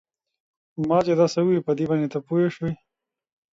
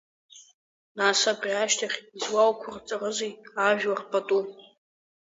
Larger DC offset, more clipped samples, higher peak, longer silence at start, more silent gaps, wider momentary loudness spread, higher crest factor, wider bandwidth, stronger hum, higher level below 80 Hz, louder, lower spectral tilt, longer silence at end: neither; neither; about the same, -6 dBFS vs -8 dBFS; first, 0.8 s vs 0.35 s; second, none vs 0.54-0.95 s; about the same, 11 LU vs 11 LU; about the same, 18 dB vs 20 dB; about the same, 7.8 kHz vs 7.8 kHz; neither; first, -60 dBFS vs -76 dBFS; first, -23 LUFS vs -26 LUFS; first, -7.5 dB/octave vs -1.5 dB/octave; first, 0.85 s vs 0.6 s